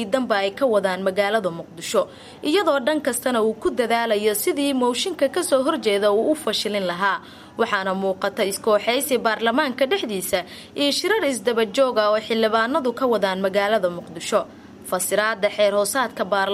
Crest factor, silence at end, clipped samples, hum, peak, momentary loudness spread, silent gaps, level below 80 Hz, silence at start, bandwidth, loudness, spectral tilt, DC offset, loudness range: 16 dB; 0 s; under 0.1%; none; -6 dBFS; 5 LU; none; -62 dBFS; 0 s; 16 kHz; -21 LUFS; -3 dB/octave; under 0.1%; 1 LU